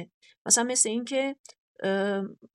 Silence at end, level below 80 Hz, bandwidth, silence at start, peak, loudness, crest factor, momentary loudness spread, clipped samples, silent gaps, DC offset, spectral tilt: 0.1 s; -88 dBFS; 14.5 kHz; 0 s; -6 dBFS; -26 LUFS; 22 dB; 13 LU; under 0.1%; 0.14-0.21 s, 0.38-0.45 s, 1.39-1.44 s, 1.58-1.75 s; under 0.1%; -2 dB/octave